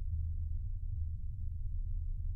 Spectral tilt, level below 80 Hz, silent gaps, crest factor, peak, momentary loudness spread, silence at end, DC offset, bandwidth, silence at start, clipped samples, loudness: -11 dB/octave; -38 dBFS; none; 10 dB; -26 dBFS; 3 LU; 0 s; under 0.1%; 0.3 kHz; 0 s; under 0.1%; -42 LUFS